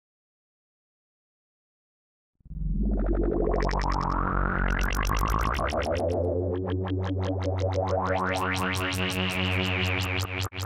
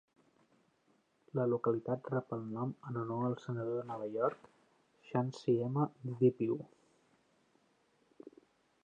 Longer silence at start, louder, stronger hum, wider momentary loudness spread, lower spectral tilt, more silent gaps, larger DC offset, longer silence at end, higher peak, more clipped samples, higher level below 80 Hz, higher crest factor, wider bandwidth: first, 2.5 s vs 1.35 s; first, -28 LUFS vs -37 LUFS; neither; second, 3 LU vs 9 LU; second, -5.5 dB/octave vs -9 dB/octave; neither; neither; second, 0 s vs 0.55 s; first, -10 dBFS vs -18 dBFS; neither; first, -34 dBFS vs -82 dBFS; about the same, 18 dB vs 20 dB; first, 16.5 kHz vs 7.6 kHz